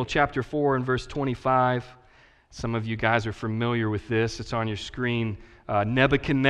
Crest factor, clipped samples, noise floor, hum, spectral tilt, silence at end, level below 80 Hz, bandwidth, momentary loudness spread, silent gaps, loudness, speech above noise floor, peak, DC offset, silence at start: 20 dB; under 0.1%; -57 dBFS; none; -6.5 dB/octave; 0 s; -46 dBFS; 9.8 kHz; 9 LU; none; -26 LUFS; 31 dB; -6 dBFS; under 0.1%; 0 s